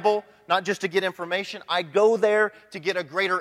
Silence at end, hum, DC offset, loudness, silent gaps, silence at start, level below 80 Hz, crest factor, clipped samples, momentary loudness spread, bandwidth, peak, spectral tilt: 0 s; none; under 0.1%; -24 LUFS; none; 0 s; -76 dBFS; 16 dB; under 0.1%; 8 LU; 13.5 kHz; -8 dBFS; -4 dB/octave